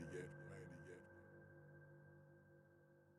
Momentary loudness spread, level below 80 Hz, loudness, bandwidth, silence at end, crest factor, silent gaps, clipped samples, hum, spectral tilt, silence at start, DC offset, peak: 13 LU; -82 dBFS; -60 LUFS; 12 kHz; 0 s; 20 dB; none; under 0.1%; none; -6.5 dB/octave; 0 s; under 0.1%; -40 dBFS